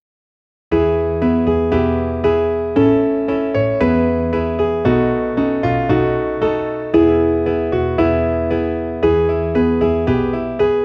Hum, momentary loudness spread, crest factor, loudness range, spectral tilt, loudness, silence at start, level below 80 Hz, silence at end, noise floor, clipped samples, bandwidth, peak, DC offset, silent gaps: none; 4 LU; 14 dB; 1 LU; -9.5 dB/octave; -17 LUFS; 0.7 s; -32 dBFS; 0 s; under -90 dBFS; under 0.1%; 6 kHz; -2 dBFS; under 0.1%; none